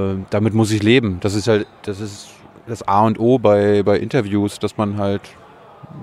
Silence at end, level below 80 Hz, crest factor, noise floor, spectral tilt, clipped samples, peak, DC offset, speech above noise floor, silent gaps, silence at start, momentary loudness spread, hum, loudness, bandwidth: 0 s; -52 dBFS; 18 dB; -41 dBFS; -6.5 dB/octave; under 0.1%; 0 dBFS; under 0.1%; 24 dB; none; 0 s; 14 LU; none; -17 LUFS; 13.5 kHz